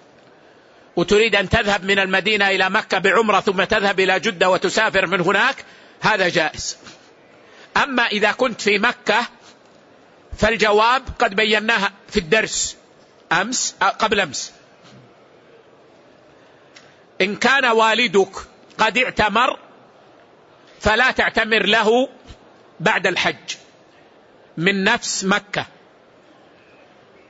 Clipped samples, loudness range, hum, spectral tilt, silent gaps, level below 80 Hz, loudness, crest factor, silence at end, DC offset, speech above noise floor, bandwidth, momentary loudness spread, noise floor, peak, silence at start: under 0.1%; 6 LU; none; -3 dB/octave; none; -46 dBFS; -18 LUFS; 18 dB; 1.65 s; under 0.1%; 32 dB; 8 kHz; 10 LU; -50 dBFS; -4 dBFS; 0.95 s